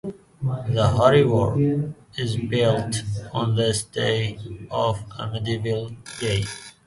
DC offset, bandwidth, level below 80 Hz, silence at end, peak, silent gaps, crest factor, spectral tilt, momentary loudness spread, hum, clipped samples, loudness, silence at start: under 0.1%; 11.5 kHz; -46 dBFS; 0.15 s; -2 dBFS; none; 20 dB; -5.5 dB/octave; 12 LU; none; under 0.1%; -23 LUFS; 0.05 s